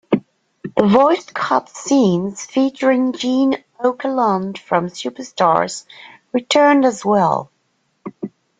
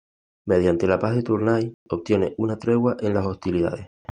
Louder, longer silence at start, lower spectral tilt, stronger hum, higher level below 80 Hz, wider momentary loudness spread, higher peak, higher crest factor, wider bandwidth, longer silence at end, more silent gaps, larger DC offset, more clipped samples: first, -17 LUFS vs -23 LUFS; second, 0.1 s vs 0.45 s; second, -5 dB/octave vs -8.5 dB/octave; neither; second, -60 dBFS vs -54 dBFS; first, 14 LU vs 7 LU; about the same, -2 dBFS vs -4 dBFS; about the same, 16 dB vs 18 dB; about the same, 9.4 kHz vs 9.6 kHz; about the same, 0.3 s vs 0.3 s; second, none vs 1.74-1.86 s; neither; neither